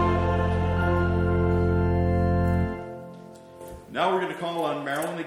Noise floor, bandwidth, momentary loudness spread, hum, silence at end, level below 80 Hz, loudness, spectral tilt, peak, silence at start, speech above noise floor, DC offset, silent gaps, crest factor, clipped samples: -44 dBFS; 14 kHz; 18 LU; none; 0 s; -38 dBFS; -25 LUFS; -7.5 dB/octave; -8 dBFS; 0 s; 18 dB; under 0.1%; none; 16 dB; under 0.1%